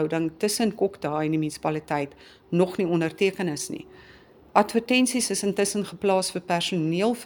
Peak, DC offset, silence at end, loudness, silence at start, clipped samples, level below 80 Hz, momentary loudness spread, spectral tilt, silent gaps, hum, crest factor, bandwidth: -4 dBFS; under 0.1%; 0 s; -25 LUFS; 0 s; under 0.1%; -62 dBFS; 7 LU; -4.5 dB/octave; none; none; 22 dB; over 20 kHz